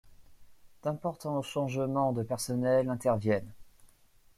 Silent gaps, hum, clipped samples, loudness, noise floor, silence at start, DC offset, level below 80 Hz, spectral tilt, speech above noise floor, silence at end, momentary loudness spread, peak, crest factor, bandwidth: none; none; under 0.1%; -31 LUFS; -62 dBFS; 0.05 s; under 0.1%; -62 dBFS; -6.5 dB/octave; 31 dB; 0.7 s; 7 LU; -16 dBFS; 16 dB; 16 kHz